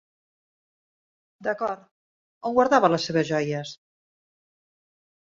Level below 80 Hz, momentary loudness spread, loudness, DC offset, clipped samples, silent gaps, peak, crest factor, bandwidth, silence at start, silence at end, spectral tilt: -68 dBFS; 15 LU; -24 LUFS; under 0.1%; under 0.1%; 1.91-2.41 s; -4 dBFS; 24 dB; 7.8 kHz; 1.4 s; 1.45 s; -5.5 dB/octave